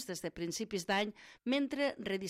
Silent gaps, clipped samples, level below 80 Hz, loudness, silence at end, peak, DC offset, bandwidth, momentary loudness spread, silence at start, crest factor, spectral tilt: none; under 0.1%; -68 dBFS; -36 LUFS; 0 s; -22 dBFS; under 0.1%; 16 kHz; 7 LU; 0 s; 16 dB; -4 dB/octave